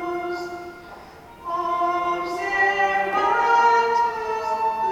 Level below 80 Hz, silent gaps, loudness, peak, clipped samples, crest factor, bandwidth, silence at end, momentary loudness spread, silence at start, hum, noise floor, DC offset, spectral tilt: -56 dBFS; none; -21 LUFS; -6 dBFS; under 0.1%; 16 dB; 16.5 kHz; 0 s; 18 LU; 0 s; none; -43 dBFS; under 0.1%; -3.5 dB/octave